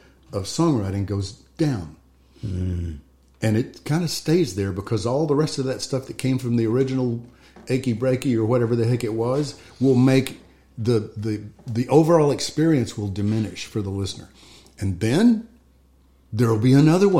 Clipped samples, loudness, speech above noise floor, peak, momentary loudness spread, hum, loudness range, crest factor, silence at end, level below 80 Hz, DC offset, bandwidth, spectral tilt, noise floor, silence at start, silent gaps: under 0.1%; -22 LUFS; 35 dB; -4 dBFS; 13 LU; none; 5 LU; 18 dB; 0 s; -50 dBFS; 0.2%; 16 kHz; -6.5 dB/octave; -56 dBFS; 0.3 s; none